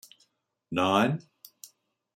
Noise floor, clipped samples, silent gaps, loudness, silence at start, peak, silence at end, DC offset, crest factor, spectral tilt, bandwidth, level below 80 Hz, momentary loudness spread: -72 dBFS; under 0.1%; none; -27 LUFS; 0.7 s; -10 dBFS; 0.5 s; under 0.1%; 22 dB; -5.5 dB/octave; 16 kHz; -72 dBFS; 24 LU